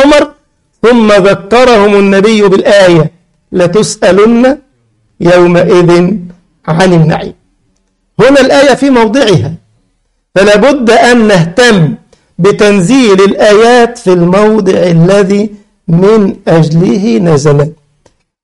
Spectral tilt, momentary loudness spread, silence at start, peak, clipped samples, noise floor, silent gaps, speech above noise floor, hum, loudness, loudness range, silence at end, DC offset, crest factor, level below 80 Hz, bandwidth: -6 dB/octave; 9 LU; 0 s; 0 dBFS; 0.7%; -57 dBFS; none; 52 dB; none; -6 LUFS; 3 LU; 0.7 s; under 0.1%; 6 dB; -36 dBFS; 11.5 kHz